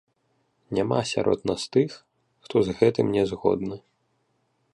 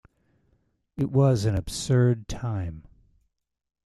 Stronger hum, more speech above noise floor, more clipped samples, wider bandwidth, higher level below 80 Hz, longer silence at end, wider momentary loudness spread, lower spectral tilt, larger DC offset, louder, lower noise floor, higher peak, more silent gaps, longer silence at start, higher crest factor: neither; about the same, 47 dB vs 45 dB; neither; second, 11 kHz vs 12.5 kHz; second, -56 dBFS vs -48 dBFS; about the same, 0.95 s vs 1.05 s; second, 8 LU vs 15 LU; about the same, -6 dB/octave vs -6.5 dB/octave; neither; about the same, -25 LUFS vs -25 LUFS; about the same, -71 dBFS vs -69 dBFS; first, -4 dBFS vs -10 dBFS; neither; second, 0.7 s vs 0.95 s; about the same, 22 dB vs 18 dB